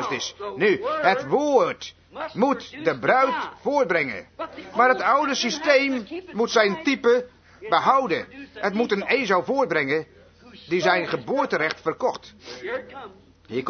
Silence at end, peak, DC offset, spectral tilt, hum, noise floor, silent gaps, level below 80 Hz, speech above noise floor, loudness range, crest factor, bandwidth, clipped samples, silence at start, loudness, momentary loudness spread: 0 s; -4 dBFS; under 0.1%; -4 dB/octave; none; -48 dBFS; none; -64 dBFS; 25 dB; 3 LU; 20 dB; 6.6 kHz; under 0.1%; 0 s; -22 LUFS; 15 LU